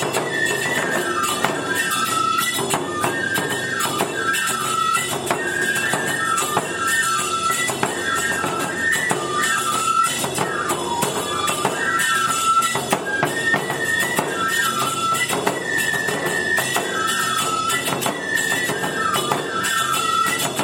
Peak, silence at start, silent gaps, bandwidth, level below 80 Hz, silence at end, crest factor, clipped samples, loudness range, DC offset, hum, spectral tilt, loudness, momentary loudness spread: 0 dBFS; 0 s; none; 16.5 kHz; -58 dBFS; 0 s; 20 dB; under 0.1%; 1 LU; under 0.1%; none; -2 dB/octave; -20 LUFS; 3 LU